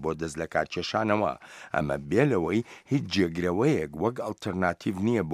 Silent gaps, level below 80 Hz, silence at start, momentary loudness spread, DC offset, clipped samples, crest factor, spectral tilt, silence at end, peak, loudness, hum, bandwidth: none; -54 dBFS; 0 s; 7 LU; under 0.1%; under 0.1%; 20 dB; -6.5 dB/octave; 0 s; -8 dBFS; -28 LUFS; none; 15 kHz